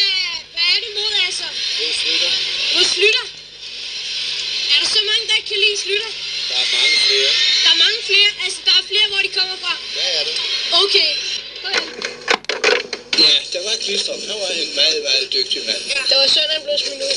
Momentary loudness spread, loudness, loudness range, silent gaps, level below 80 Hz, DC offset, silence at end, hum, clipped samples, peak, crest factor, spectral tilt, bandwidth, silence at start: 10 LU; -15 LUFS; 4 LU; none; -60 dBFS; under 0.1%; 0 s; 50 Hz at -60 dBFS; under 0.1%; 0 dBFS; 18 dB; 1 dB/octave; 11.5 kHz; 0 s